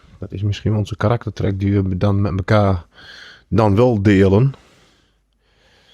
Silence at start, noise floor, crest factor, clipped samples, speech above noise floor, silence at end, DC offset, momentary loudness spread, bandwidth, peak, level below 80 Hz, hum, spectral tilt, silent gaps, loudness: 0.2 s; -61 dBFS; 18 dB; under 0.1%; 44 dB; 1.4 s; under 0.1%; 11 LU; 7.4 kHz; 0 dBFS; -44 dBFS; none; -8.5 dB/octave; none; -17 LUFS